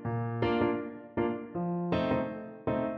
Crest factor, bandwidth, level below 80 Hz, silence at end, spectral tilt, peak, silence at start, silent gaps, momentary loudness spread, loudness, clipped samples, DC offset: 16 dB; 5.8 kHz; -56 dBFS; 0 s; -9.5 dB/octave; -16 dBFS; 0 s; none; 8 LU; -32 LUFS; under 0.1%; under 0.1%